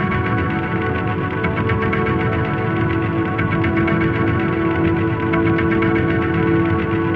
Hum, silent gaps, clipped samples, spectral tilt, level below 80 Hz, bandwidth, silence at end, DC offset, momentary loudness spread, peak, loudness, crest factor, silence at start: none; none; under 0.1%; -9.5 dB/octave; -36 dBFS; 5.2 kHz; 0 s; 0.3%; 4 LU; -6 dBFS; -18 LUFS; 12 dB; 0 s